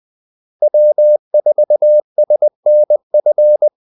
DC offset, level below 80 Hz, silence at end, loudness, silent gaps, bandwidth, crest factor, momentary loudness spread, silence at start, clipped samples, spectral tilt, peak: under 0.1%; -82 dBFS; 0.15 s; -12 LUFS; 1.19-1.31 s, 2.04-2.16 s, 2.55-2.63 s, 3.03-3.10 s; 0.9 kHz; 8 dB; 3 LU; 0.6 s; under 0.1%; -11 dB/octave; -4 dBFS